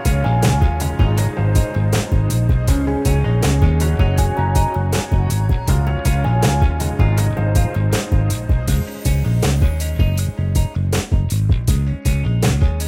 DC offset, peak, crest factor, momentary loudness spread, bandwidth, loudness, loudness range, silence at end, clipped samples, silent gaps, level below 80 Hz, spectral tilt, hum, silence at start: under 0.1%; -2 dBFS; 14 dB; 3 LU; 17 kHz; -18 LUFS; 2 LU; 0 s; under 0.1%; none; -20 dBFS; -6 dB/octave; none; 0 s